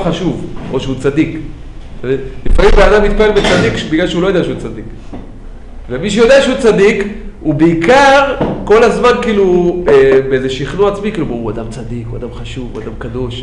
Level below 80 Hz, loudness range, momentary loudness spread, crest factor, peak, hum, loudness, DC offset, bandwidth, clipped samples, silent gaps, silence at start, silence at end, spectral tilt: -22 dBFS; 5 LU; 17 LU; 12 dB; 0 dBFS; none; -11 LUFS; under 0.1%; 10.5 kHz; under 0.1%; none; 0 s; 0 s; -5.5 dB/octave